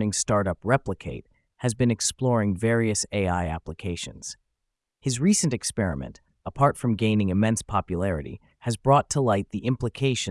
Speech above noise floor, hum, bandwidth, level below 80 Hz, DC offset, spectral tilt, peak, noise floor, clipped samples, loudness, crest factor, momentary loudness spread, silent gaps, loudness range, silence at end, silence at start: 57 dB; none; 12 kHz; -48 dBFS; under 0.1%; -5 dB/octave; -6 dBFS; -82 dBFS; under 0.1%; -25 LUFS; 20 dB; 14 LU; none; 3 LU; 0 s; 0 s